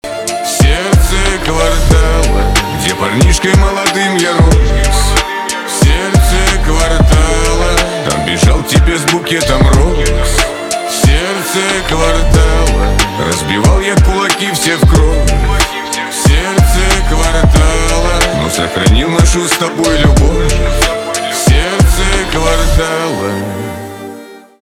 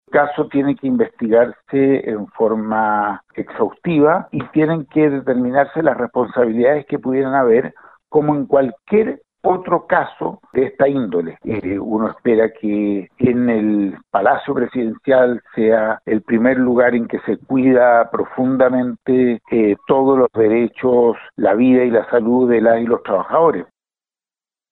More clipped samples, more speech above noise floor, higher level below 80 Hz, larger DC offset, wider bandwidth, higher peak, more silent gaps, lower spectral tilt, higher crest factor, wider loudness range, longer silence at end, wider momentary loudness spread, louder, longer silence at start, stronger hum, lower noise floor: neither; second, 22 dB vs over 74 dB; first, -12 dBFS vs -54 dBFS; neither; first, 17 kHz vs 4.1 kHz; about the same, 0 dBFS vs -2 dBFS; neither; second, -4.5 dB/octave vs -11 dB/octave; about the same, 10 dB vs 14 dB; about the same, 1 LU vs 3 LU; second, 0.25 s vs 1.05 s; about the same, 6 LU vs 7 LU; first, -11 LUFS vs -16 LUFS; about the same, 0.05 s vs 0.1 s; neither; second, -32 dBFS vs under -90 dBFS